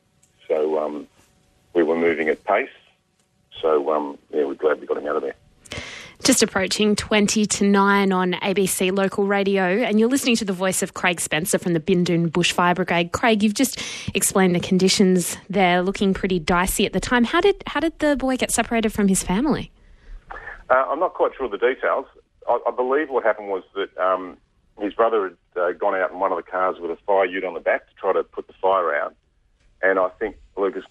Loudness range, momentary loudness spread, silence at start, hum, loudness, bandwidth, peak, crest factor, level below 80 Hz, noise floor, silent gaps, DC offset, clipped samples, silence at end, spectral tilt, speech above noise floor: 5 LU; 9 LU; 0.5 s; none; -21 LUFS; 13.5 kHz; -2 dBFS; 18 dB; -46 dBFS; -65 dBFS; none; under 0.1%; under 0.1%; 0.05 s; -4 dB/octave; 44 dB